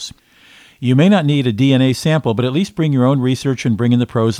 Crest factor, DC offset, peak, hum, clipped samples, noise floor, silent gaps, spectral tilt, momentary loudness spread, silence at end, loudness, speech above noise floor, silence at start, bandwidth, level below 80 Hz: 14 dB; under 0.1%; 0 dBFS; none; under 0.1%; -47 dBFS; none; -7 dB/octave; 6 LU; 0 s; -15 LUFS; 33 dB; 0 s; 14 kHz; -52 dBFS